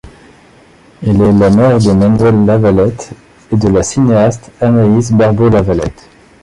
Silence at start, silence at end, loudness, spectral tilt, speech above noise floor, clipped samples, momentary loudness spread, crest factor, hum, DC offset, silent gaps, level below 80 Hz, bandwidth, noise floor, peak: 0.05 s; 0.5 s; -10 LUFS; -7.5 dB/octave; 33 dB; under 0.1%; 9 LU; 10 dB; none; under 0.1%; none; -32 dBFS; 11 kHz; -42 dBFS; 0 dBFS